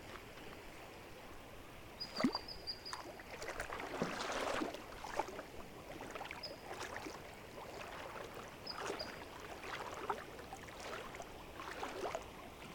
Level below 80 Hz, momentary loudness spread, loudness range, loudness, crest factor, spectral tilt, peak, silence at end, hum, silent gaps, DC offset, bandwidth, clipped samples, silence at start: -62 dBFS; 12 LU; 5 LU; -46 LUFS; 24 dB; -3.5 dB/octave; -22 dBFS; 0 s; none; none; under 0.1%; 19 kHz; under 0.1%; 0 s